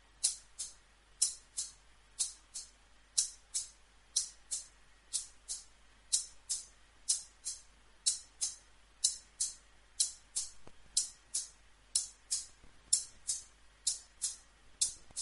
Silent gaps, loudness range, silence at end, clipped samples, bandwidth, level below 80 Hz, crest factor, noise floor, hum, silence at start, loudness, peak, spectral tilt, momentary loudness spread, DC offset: none; 2 LU; 0 s; under 0.1%; 11.5 kHz; -66 dBFS; 30 dB; -63 dBFS; none; 0.2 s; -37 LUFS; -10 dBFS; 3 dB/octave; 13 LU; under 0.1%